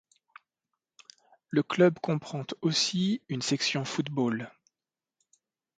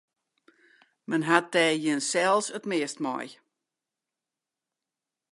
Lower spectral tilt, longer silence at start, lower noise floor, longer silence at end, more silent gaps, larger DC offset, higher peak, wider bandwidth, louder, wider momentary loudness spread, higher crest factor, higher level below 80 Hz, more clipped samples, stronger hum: about the same, -4.5 dB/octave vs -3.5 dB/octave; first, 1.5 s vs 1.1 s; about the same, under -90 dBFS vs -89 dBFS; second, 1.3 s vs 2 s; neither; neither; second, -10 dBFS vs -4 dBFS; second, 9.4 kHz vs 11.5 kHz; second, -29 LUFS vs -26 LUFS; second, 8 LU vs 11 LU; about the same, 22 dB vs 26 dB; first, -74 dBFS vs -84 dBFS; neither; neither